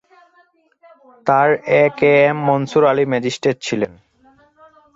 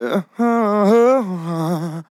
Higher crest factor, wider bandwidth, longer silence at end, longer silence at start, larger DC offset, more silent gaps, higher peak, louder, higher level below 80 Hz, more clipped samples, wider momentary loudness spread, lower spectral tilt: about the same, 16 dB vs 12 dB; second, 8 kHz vs 14.5 kHz; first, 1.1 s vs 0.1 s; first, 1.25 s vs 0 s; neither; neither; about the same, -2 dBFS vs -4 dBFS; about the same, -16 LUFS vs -17 LUFS; first, -60 dBFS vs -86 dBFS; neither; about the same, 9 LU vs 10 LU; second, -6 dB/octave vs -7.5 dB/octave